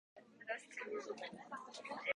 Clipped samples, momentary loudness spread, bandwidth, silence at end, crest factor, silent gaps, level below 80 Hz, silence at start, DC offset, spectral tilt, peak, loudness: under 0.1%; 7 LU; 11 kHz; 0 s; 22 dB; none; -88 dBFS; 0.15 s; under 0.1%; -2.5 dB/octave; -26 dBFS; -48 LUFS